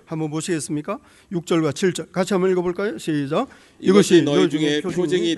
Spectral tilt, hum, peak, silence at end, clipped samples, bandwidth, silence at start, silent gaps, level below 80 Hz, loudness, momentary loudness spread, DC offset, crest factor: -5.5 dB/octave; none; 0 dBFS; 0 s; under 0.1%; 12 kHz; 0.1 s; none; -60 dBFS; -20 LUFS; 12 LU; under 0.1%; 20 dB